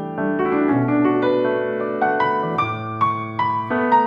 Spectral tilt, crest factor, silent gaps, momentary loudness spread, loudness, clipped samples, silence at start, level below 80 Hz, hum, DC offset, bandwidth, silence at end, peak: -8.5 dB/octave; 14 dB; none; 5 LU; -20 LUFS; under 0.1%; 0 s; -58 dBFS; none; under 0.1%; 5.4 kHz; 0 s; -6 dBFS